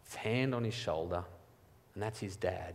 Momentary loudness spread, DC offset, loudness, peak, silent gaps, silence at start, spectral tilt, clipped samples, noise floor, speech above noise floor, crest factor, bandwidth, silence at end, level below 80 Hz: 9 LU; under 0.1%; -37 LUFS; -18 dBFS; none; 0.05 s; -6 dB/octave; under 0.1%; -63 dBFS; 27 dB; 20 dB; 15.5 kHz; 0 s; -62 dBFS